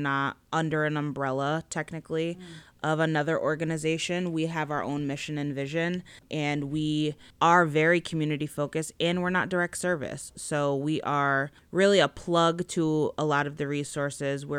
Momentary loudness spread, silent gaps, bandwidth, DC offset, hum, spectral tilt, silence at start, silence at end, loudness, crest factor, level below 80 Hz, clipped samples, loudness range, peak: 9 LU; none; 13.5 kHz; under 0.1%; none; -5 dB/octave; 0 s; 0 s; -28 LUFS; 20 dB; -60 dBFS; under 0.1%; 4 LU; -8 dBFS